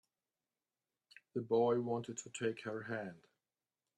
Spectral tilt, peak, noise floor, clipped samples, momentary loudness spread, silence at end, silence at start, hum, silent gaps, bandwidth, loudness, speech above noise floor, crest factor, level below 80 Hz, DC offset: -5.5 dB/octave; -22 dBFS; under -90 dBFS; under 0.1%; 13 LU; 0.8 s; 1.35 s; none; none; 10 kHz; -39 LUFS; over 52 dB; 18 dB; -84 dBFS; under 0.1%